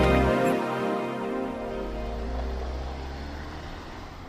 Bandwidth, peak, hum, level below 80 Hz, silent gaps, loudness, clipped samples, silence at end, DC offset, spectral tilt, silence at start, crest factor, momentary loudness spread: 13.5 kHz; -8 dBFS; none; -36 dBFS; none; -29 LUFS; under 0.1%; 0 s; under 0.1%; -6.5 dB/octave; 0 s; 20 dB; 15 LU